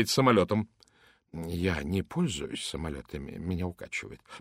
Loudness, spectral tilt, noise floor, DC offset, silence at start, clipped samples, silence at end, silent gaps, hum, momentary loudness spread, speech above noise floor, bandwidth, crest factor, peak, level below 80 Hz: -31 LUFS; -5 dB/octave; -64 dBFS; under 0.1%; 0 s; under 0.1%; 0 s; none; none; 17 LU; 34 dB; 16 kHz; 22 dB; -8 dBFS; -50 dBFS